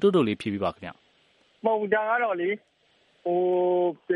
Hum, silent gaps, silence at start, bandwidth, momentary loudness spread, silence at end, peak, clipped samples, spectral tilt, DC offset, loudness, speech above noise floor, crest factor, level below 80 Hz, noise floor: none; none; 0 s; 10.5 kHz; 12 LU; 0 s; -10 dBFS; under 0.1%; -7.5 dB/octave; under 0.1%; -26 LUFS; 40 dB; 18 dB; -68 dBFS; -64 dBFS